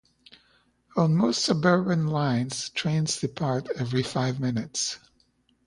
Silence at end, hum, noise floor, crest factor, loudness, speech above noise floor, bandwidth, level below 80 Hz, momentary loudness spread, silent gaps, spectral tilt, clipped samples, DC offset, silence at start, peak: 0.7 s; none; -67 dBFS; 18 dB; -26 LUFS; 41 dB; 11 kHz; -62 dBFS; 7 LU; none; -5 dB/octave; under 0.1%; under 0.1%; 0.95 s; -8 dBFS